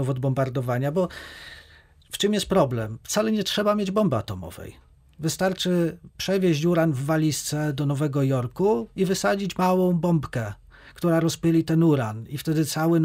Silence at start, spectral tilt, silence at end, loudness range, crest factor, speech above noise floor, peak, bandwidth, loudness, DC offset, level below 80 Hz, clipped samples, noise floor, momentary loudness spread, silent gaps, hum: 0 s; -6 dB/octave; 0 s; 2 LU; 16 dB; 30 dB; -8 dBFS; 16 kHz; -24 LUFS; under 0.1%; -52 dBFS; under 0.1%; -53 dBFS; 11 LU; none; none